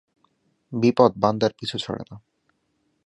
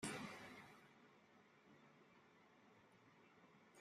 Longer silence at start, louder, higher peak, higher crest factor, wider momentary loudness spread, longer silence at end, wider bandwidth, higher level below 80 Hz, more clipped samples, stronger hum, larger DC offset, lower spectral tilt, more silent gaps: first, 0.7 s vs 0 s; first, -22 LUFS vs -58 LUFS; first, -2 dBFS vs -34 dBFS; about the same, 22 dB vs 26 dB; about the same, 16 LU vs 17 LU; first, 0.9 s vs 0 s; second, 11 kHz vs 15 kHz; first, -60 dBFS vs -88 dBFS; neither; neither; neither; first, -6.5 dB/octave vs -3.5 dB/octave; neither